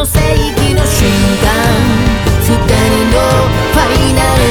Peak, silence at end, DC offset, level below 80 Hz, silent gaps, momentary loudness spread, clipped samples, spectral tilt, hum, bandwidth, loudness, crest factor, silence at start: 0 dBFS; 0 s; under 0.1%; -16 dBFS; none; 2 LU; under 0.1%; -5 dB/octave; none; over 20 kHz; -10 LUFS; 10 dB; 0 s